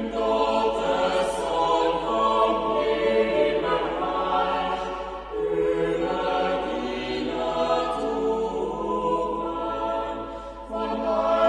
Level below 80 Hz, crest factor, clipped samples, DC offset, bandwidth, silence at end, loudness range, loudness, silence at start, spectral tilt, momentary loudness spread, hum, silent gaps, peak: -46 dBFS; 16 dB; under 0.1%; under 0.1%; 11 kHz; 0 s; 4 LU; -25 LUFS; 0 s; -5 dB/octave; 7 LU; none; none; -10 dBFS